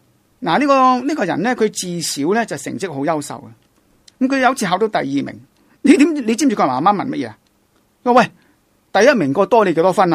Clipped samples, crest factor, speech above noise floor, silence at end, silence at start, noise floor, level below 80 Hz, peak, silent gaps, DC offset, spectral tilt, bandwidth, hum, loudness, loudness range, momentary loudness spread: under 0.1%; 16 dB; 43 dB; 0 s; 0.4 s; -59 dBFS; -60 dBFS; 0 dBFS; none; under 0.1%; -4.5 dB/octave; 15 kHz; none; -16 LUFS; 4 LU; 11 LU